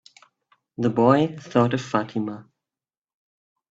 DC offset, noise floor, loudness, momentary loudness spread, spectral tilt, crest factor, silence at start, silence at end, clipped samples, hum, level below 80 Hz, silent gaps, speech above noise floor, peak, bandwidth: under 0.1%; under -90 dBFS; -22 LUFS; 15 LU; -7.5 dB/octave; 22 dB; 0.8 s; 1.3 s; under 0.1%; none; -62 dBFS; none; over 69 dB; -2 dBFS; 7.8 kHz